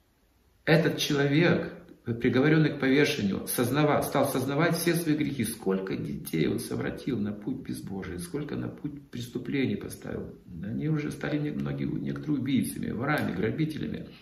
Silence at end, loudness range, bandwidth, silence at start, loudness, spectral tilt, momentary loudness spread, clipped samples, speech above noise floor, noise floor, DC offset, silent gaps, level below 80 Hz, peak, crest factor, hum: 0.05 s; 8 LU; 15.5 kHz; 0.65 s; -28 LUFS; -5.5 dB/octave; 13 LU; under 0.1%; 37 dB; -65 dBFS; under 0.1%; none; -56 dBFS; -8 dBFS; 20 dB; none